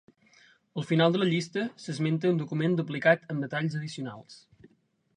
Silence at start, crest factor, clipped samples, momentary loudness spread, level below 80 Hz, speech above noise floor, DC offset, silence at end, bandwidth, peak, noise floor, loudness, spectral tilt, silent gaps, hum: 0.75 s; 22 dB; under 0.1%; 14 LU; -74 dBFS; 40 dB; under 0.1%; 0.8 s; 10 kHz; -8 dBFS; -67 dBFS; -28 LUFS; -6.5 dB/octave; none; none